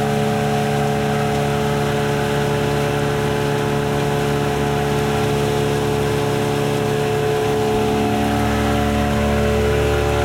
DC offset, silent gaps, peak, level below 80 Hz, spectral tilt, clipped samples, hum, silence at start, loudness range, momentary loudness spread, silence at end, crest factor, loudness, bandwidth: under 0.1%; none; -6 dBFS; -32 dBFS; -6 dB/octave; under 0.1%; none; 0 s; 1 LU; 2 LU; 0 s; 12 dB; -19 LUFS; 16.5 kHz